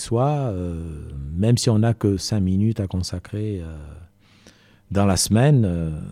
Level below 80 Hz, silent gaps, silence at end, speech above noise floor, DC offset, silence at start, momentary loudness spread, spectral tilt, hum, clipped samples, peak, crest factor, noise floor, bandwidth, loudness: -40 dBFS; none; 0 s; 31 dB; under 0.1%; 0 s; 15 LU; -6 dB/octave; none; under 0.1%; -6 dBFS; 16 dB; -52 dBFS; 15 kHz; -21 LUFS